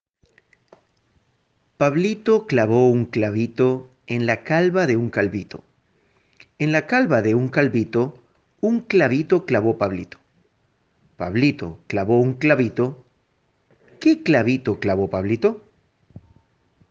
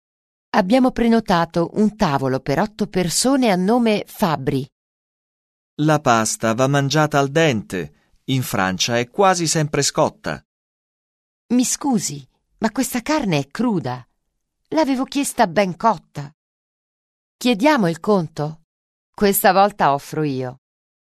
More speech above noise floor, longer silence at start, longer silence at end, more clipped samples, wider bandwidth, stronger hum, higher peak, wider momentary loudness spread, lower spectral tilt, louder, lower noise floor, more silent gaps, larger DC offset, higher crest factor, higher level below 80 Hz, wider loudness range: second, 47 dB vs 55 dB; first, 1.8 s vs 0.55 s; first, 1.3 s vs 0.55 s; neither; second, 7.4 kHz vs 13.5 kHz; neither; about the same, -2 dBFS vs -2 dBFS; second, 9 LU vs 12 LU; first, -7.5 dB/octave vs -4.5 dB/octave; about the same, -20 LUFS vs -19 LUFS; second, -66 dBFS vs -74 dBFS; second, none vs 4.72-5.77 s, 10.45-11.49 s, 16.34-17.39 s, 18.64-19.13 s; neither; about the same, 20 dB vs 18 dB; second, -62 dBFS vs -48 dBFS; about the same, 3 LU vs 4 LU